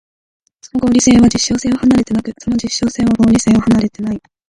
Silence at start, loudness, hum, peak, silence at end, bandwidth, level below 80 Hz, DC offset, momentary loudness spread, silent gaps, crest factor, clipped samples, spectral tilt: 0.75 s; -13 LUFS; none; 0 dBFS; 0.3 s; 11.5 kHz; -36 dBFS; under 0.1%; 10 LU; none; 14 dB; under 0.1%; -4.5 dB/octave